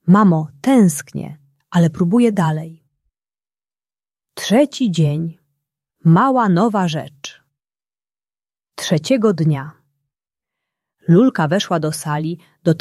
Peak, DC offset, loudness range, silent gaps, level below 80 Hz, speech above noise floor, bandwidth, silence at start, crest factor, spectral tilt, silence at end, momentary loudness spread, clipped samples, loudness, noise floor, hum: -2 dBFS; under 0.1%; 5 LU; none; -60 dBFS; over 75 dB; 13.5 kHz; 0.05 s; 16 dB; -6.5 dB/octave; 0 s; 16 LU; under 0.1%; -16 LUFS; under -90 dBFS; none